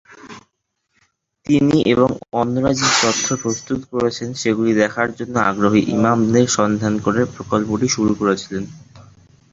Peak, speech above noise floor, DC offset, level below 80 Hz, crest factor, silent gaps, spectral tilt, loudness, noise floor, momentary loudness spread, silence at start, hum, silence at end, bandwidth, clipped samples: -2 dBFS; 54 dB; under 0.1%; -48 dBFS; 16 dB; none; -4.5 dB/octave; -18 LUFS; -71 dBFS; 8 LU; 0.25 s; none; 0.5 s; 7.8 kHz; under 0.1%